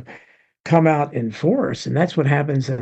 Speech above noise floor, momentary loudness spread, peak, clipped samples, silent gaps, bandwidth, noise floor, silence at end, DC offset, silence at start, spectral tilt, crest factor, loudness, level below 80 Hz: 32 dB; 6 LU; -2 dBFS; under 0.1%; 0.60-0.64 s; 8.2 kHz; -50 dBFS; 0 s; under 0.1%; 0 s; -7.5 dB/octave; 18 dB; -19 LUFS; -60 dBFS